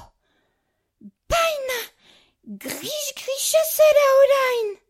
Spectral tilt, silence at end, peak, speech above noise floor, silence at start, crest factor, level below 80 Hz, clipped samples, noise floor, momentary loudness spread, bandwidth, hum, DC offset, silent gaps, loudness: -1 dB/octave; 0.15 s; -6 dBFS; 54 dB; 0 s; 16 dB; -48 dBFS; under 0.1%; -73 dBFS; 15 LU; 16.5 kHz; none; under 0.1%; none; -19 LUFS